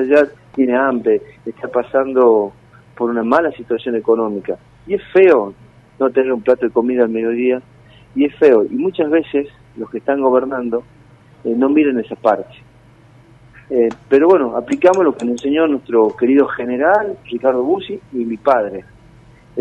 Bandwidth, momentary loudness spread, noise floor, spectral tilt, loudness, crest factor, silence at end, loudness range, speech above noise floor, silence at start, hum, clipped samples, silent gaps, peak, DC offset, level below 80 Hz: 8.6 kHz; 12 LU; -46 dBFS; -6.5 dB/octave; -16 LUFS; 16 dB; 0 s; 3 LU; 31 dB; 0 s; none; under 0.1%; none; 0 dBFS; under 0.1%; -54 dBFS